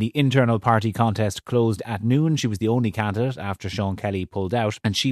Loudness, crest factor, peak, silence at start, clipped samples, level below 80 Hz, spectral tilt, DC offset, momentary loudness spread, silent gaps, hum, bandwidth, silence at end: -23 LUFS; 18 dB; -4 dBFS; 0 s; under 0.1%; -54 dBFS; -6 dB/octave; under 0.1%; 8 LU; none; none; 13.5 kHz; 0 s